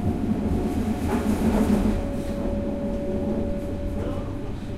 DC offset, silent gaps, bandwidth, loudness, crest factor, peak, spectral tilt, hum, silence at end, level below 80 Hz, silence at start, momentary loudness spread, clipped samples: under 0.1%; none; 14.5 kHz; -26 LUFS; 14 dB; -10 dBFS; -7.5 dB/octave; none; 0 s; -32 dBFS; 0 s; 8 LU; under 0.1%